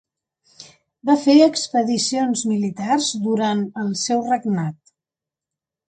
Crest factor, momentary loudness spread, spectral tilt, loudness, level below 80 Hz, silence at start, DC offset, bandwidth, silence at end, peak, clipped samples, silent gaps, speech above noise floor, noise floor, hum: 18 dB; 10 LU; -4.5 dB/octave; -19 LUFS; -68 dBFS; 0.6 s; under 0.1%; 9.4 kHz; 1.15 s; -2 dBFS; under 0.1%; none; 70 dB; -89 dBFS; none